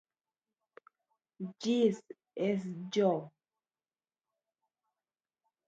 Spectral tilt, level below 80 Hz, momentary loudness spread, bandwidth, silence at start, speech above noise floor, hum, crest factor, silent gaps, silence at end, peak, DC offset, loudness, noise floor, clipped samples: -6.5 dB/octave; -86 dBFS; 16 LU; 8 kHz; 1.4 s; over 58 dB; none; 20 dB; none; 2.4 s; -16 dBFS; under 0.1%; -33 LUFS; under -90 dBFS; under 0.1%